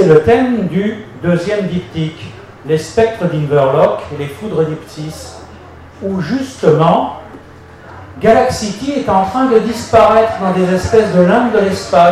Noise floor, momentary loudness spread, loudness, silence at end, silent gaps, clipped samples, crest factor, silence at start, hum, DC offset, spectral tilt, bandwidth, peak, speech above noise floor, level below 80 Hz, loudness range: -36 dBFS; 16 LU; -13 LUFS; 0 s; none; under 0.1%; 12 dB; 0 s; none; under 0.1%; -6.5 dB/octave; 13.5 kHz; 0 dBFS; 24 dB; -40 dBFS; 6 LU